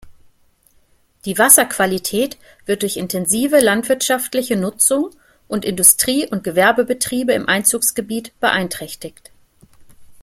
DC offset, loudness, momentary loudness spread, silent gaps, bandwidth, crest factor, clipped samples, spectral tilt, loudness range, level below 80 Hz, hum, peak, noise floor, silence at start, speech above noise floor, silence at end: under 0.1%; -15 LUFS; 16 LU; none; 16.5 kHz; 18 dB; under 0.1%; -2.5 dB/octave; 3 LU; -54 dBFS; none; 0 dBFS; -56 dBFS; 0.05 s; 39 dB; 0.1 s